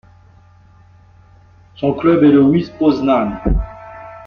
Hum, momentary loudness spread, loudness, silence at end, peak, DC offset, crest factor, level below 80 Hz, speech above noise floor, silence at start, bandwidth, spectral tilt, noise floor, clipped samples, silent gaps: none; 18 LU; -14 LUFS; 0 s; -2 dBFS; under 0.1%; 14 dB; -30 dBFS; 33 dB; 1.8 s; 6 kHz; -9.5 dB/octave; -46 dBFS; under 0.1%; none